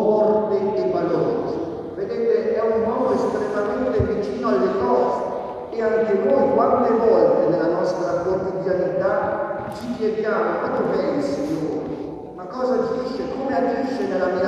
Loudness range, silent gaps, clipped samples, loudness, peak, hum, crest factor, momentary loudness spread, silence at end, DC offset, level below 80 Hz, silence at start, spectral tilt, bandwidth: 5 LU; none; under 0.1%; -21 LUFS; -4 dBFS; none; 16 dB; 10 LU; 0 s; under 0.1%; -50 dBFS; 0 s; -7.5 dB/octave; 9.6 kHz